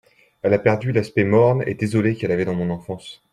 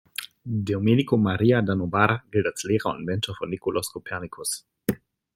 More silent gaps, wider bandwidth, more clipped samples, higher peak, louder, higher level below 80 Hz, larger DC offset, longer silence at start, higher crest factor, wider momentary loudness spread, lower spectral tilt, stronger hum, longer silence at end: neither; second, 11.5 kHz vs 16.5 kHz; neither; about the same, -2 dBFS vs -2 dBFS; first, -20 LUFS vs -25 LUFS; about the same, -56 dBFS vs -58 dBFS; neither; first, 0.45 s vs 0.2 s; about the same, 18 dB vs 22 dB; about the same, 11 LU vs 11 LU; first, -8 dB/octave vs -5.5 dB/octave; neither; second, 0.2 s vs 0.4 s